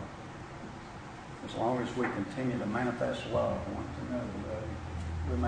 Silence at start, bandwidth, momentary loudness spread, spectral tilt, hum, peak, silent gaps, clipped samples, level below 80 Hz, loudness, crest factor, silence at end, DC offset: 0 s; 10 kHz; 13 LU; -7 dB/octave; none; -18 dBFS; none; under 0.1%; -48 dBFS; -36 LUFS; 16 dB; 0 s; under 0.1%